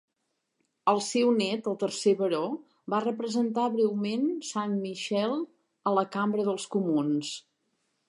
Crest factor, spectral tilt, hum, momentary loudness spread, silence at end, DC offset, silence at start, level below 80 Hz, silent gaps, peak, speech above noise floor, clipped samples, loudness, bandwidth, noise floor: 18 dB; -5 dB/octave; none; 7 LU; 0.7 s; under 0.1%; 0.85 s; -84 dBFS; none; -12 dBFS; 52 dB; under 0.1%; -28 LUFS; 11.5 kHz; -80 dBFS